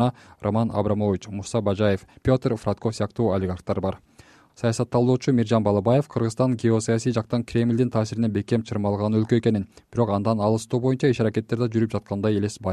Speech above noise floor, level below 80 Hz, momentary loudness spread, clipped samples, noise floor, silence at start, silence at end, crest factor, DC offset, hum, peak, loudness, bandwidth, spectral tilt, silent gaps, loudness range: 30 dB; -52 dBFS; 6 LU; under 0.1%; -53 dBFS; 0 s; 0 s; 16 dB; under 0.1%; none; -6 dBFS; -23 LUFS; 11.5 kHz; -7 dB/octave; none; 3 LU